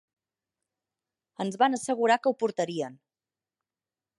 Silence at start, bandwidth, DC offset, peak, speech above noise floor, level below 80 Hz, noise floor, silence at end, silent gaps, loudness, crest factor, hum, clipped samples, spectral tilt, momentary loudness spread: 1.4 s; 11.5 kHz; under 0.1%; -10 dBFS; over 63 dB; -84 dBFS; under -90 dBFS; 1.25 s; none; -27 LUFS; 20 dB; none; under 0.1%; -4.5 dB/octave; 11 LU